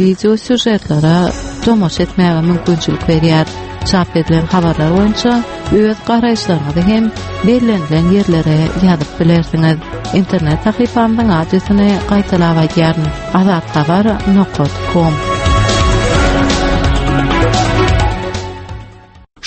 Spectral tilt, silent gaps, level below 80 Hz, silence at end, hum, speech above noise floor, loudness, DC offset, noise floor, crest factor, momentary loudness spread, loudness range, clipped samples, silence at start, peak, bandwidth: -6.5 dB/octave; none; -24 dBFS; 0 s; none; 25 dB; -12 LUFS; under 0.1%; -37 dBFS; 12 dB; 4 LU; 1 LU; under 0.1%; 0 s; 0 dBFS; 8.8 kHz